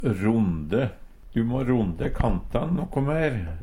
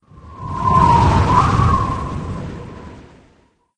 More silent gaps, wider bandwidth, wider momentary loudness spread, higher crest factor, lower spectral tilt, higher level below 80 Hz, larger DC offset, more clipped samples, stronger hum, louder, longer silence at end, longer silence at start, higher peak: neither; about the same, 11 kHz vs 10 kHz; second, 5 LU vs 21 LU; about the same, 16 dB vs 18 dB; first, -9 dB/octave vs -7 dB/octave; second, -36 dBFS vs -28 dBFS; second, under 0.1% vs 0.3%; neither; neither; second, -26 LUFS vs -15 LUFS; second, 0 s vs 0.75 s; second, 0 s vs 0.15 s; second, -8 dBFS vs 0 dBFS